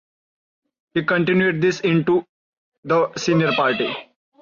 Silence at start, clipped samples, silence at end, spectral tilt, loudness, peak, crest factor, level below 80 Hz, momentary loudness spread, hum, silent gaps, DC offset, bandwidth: 0.95 s; under 0.1%; 0.4 s; -6 dB/octave; -19 LUFS; -6 dBFS; 14 dB; -62 dBFS; 7 LU; none; 2.29-2.72 s, 2.78-2.83 s; under 0.1%; 7.4 kHz